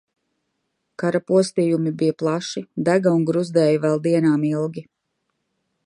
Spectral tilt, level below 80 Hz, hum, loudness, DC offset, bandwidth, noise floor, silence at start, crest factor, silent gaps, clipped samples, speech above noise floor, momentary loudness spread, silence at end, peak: -7 dB/octave; -70 dBFS; none; -20 LUFS; under 0.1%; 11 kHz; -75 dBFS; 1 s; 16 dB; none; under 0.1%; 55 dB; 8 LU; 1.05 s; -4 dBFS